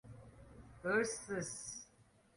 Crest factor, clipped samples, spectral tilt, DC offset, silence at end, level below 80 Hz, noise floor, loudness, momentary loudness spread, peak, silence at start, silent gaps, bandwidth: 20 dB; under 0.1%; -3.5 dB/octave; under 0.1%; 0.35 s; -68 dBFS; -69 dBFS; -40 LUFS; 23 LU; -22 dBFS; 0.05 s; none; 11.5 kHz